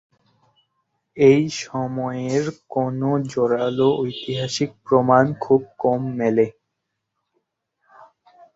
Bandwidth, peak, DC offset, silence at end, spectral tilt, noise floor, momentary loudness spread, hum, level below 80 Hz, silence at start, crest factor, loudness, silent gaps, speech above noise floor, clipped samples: 7.8 kHz; -2 dBFS; under 0.1%; 0.5 s; -6.5 dB/octave; -78 dBFS; 10 LU; none; -62 dBFS; 1.15 s; 20 dB; -20 LUFS; none; 59 dB; under 0.1%